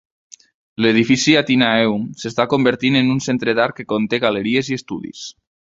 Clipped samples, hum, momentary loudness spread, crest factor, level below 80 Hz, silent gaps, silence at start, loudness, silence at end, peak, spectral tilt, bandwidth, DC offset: under 0.1%; none; 15 LU; 18 dB; -56 dBFS; none; 0.8 s; -17 LUFS; 0.45 s; 0 dBFS; -4.5 dB/octave; 7.8 kHz; under 0.1%